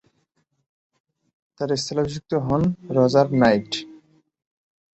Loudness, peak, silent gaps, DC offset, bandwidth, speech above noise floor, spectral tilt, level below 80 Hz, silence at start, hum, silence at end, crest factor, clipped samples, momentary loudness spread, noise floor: -21 LUFS; -4 dBFS; none; under 0.1%; 8.4 kHz; 50 dB; -6 dB/octave; -52 dBFS; 1.6 s; none; 1 s; 20 dB; under 0.1%; 11 LU; -70 dBFS